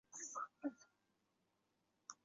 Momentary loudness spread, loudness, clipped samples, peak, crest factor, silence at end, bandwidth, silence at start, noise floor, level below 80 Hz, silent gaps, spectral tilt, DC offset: 13 LU; -50 LUFS; under 0.1%; -32 dBFS; 22 dB; 0.1 s; 7.6 kHz; 0.1 s; -85 dBFS; under -90 dBFS; none; -2.5 dB/octave; under 0.1%